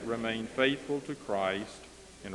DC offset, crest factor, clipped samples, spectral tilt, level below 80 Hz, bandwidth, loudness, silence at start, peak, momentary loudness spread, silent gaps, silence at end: under 0.1%; 22 dB; under 0.1%; -4.5 dB/octave; -62 dBFS; 12 kHz; -32 LUFS; 0 s; -12 dBFS; 18 LU; none; 0 s